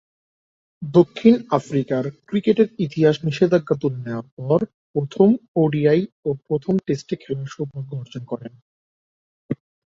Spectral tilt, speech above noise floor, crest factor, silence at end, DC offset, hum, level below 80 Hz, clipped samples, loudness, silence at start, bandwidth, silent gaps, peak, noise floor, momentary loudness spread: -8 dB/octave; over 70 dB; 18 dB; 0.45 s; under 0.1%; none; -62 dBFS; under 0.1%; -21 LUFS; 0.8 s; 7.6 kHz; 4.32-4.37 s, 4.74-4.94 s, 5.48-5.54 s, 6.12-6.23 s, 8.62-9.49 s; -2 dBFS; under -90 dBFS; 15 LU